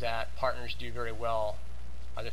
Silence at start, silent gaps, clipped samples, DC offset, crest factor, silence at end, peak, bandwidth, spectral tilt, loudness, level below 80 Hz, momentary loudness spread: 0 s; none; under 0.1%; 3%; 18 dB; 0 s; -16 dBFS; 15.5 kHz; -5 dB/octave; -35 LUFS; -44 dBFS; 13 LU